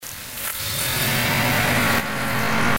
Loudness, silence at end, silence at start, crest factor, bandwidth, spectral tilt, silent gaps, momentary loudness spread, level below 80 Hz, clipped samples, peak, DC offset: -20 LUFS; 0 s; 0 s; 14 dB; 17 kHz; -3 dB/octave; none; 8 LU; -42 dBFS; under 0.1%; -8 dBFS; under 0.1%